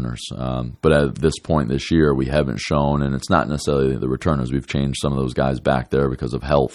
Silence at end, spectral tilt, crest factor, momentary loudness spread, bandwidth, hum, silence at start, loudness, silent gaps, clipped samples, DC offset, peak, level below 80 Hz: 0 s; -6.5 dB/octave; 18 dB; 6 LU; 12 kHz; none; 0 s; -20 LUFS; none; under 0.1%; under 0.1%; -2 dBFS; -34 dBFS